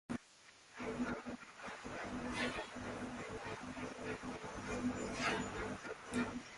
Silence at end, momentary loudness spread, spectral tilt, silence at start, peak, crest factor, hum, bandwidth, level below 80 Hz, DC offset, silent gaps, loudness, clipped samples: 0 s; 9 LU; -4.5 dB/octave; 0.1 s; -24 dBFS; 20 dB; none; 11.5 kHz; -62 dBFS; under 0.1%; none; -43 LUFS; under 0.1%